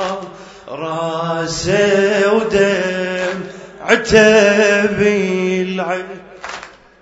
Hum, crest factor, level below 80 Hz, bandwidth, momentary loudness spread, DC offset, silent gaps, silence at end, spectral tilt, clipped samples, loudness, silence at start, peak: none; 16 dB; -44 dBFS; 8 kHz; 20 LU; under 0.1%; none; 0.3 s; -4.5 dB/octave; under 0.1%; -14 LUFS; 0 s; 0 dBFS